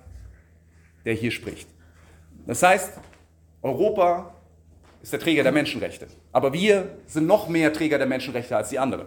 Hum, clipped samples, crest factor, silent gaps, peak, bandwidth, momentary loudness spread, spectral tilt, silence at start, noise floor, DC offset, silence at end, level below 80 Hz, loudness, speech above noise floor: none; under 0.1%; 20 dB; none; -4 dBFS; 17.5 kHz; 14 LU; -5 dB/octave; 0.05 s; -55 dBFS; under 0.1%; 0 s; -54 dBFS; -23 LUFS; 32 dB